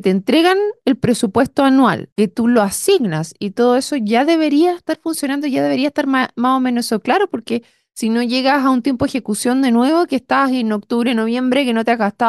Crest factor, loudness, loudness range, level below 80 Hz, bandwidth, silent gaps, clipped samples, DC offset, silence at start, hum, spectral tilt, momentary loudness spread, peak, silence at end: 12 dB; -16 LUFS; 2 LU; -54 dBFS; 12.5 kHz; 2.12-2.16 s; under 0.1%; under 0.1%; 0.05 s; none; -5 dB/octave; 6 LU; -4 dBFS; 0 s